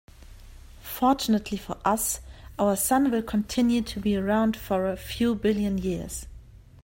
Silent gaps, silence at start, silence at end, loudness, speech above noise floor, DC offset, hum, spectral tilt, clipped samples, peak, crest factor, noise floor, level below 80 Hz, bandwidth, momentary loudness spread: none; 0.2 s; 0.05 s; -26 LUFS; 22 dB; under 0.1%; none; -4.5 dB/octave; under 0.1%; -8 dBFS; 18 dB; -47 dBFS; -46 dBFS; 16.5 kHz; 12 LU